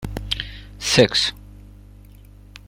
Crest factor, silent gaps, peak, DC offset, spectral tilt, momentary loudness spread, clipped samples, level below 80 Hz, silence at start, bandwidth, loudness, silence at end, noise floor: 22 dB; none; 0 dBFS; under 0.1%; -3.5 dB/octave; 12 LU; under 0.1%; -40 dBFS; 0 s; 16.5 kHz; -19 LUFS; 0.1 s; -44 dBFS